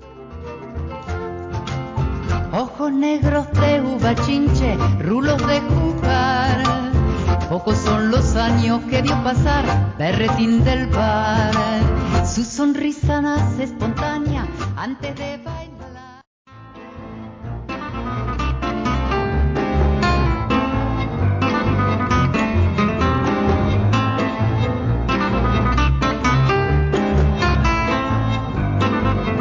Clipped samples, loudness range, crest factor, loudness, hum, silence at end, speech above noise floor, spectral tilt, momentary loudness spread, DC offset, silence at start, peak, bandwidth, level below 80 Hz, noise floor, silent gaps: under 0.1%; 8 LU; 10 dB; -19 LUFS; none; 0 s; 21 dB; -6.5 dB/octave; 11 LU; under 0.1%; 0 s; -8 dBFS; 7.8 kHz; -26 dBFS; -39 dBFS; 16.27-16.45 s